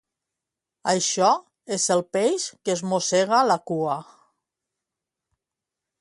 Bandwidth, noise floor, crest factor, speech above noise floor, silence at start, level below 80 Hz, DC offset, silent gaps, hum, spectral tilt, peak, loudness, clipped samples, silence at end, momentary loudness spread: 11.5 kHz; -87 dBFS; 20 dB; 64 dB; 0.85 s; -72 dBFS; under 0.1%; none; none; -3 dB/octave; -6 dBFS; -23 LUFS; under 0.1%; 2 s; 8 LU